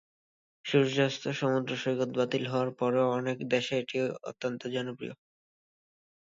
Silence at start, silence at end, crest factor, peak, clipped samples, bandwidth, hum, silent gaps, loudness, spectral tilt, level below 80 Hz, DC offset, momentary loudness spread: 0.65 s; 1.05 s; 20 dB; -12 dBFS; under 0.1%; 7.8 kHz; none; none; -30 LUFS; -5.5 dB/octave; -76 dBFS; under 0.1%; 9 LU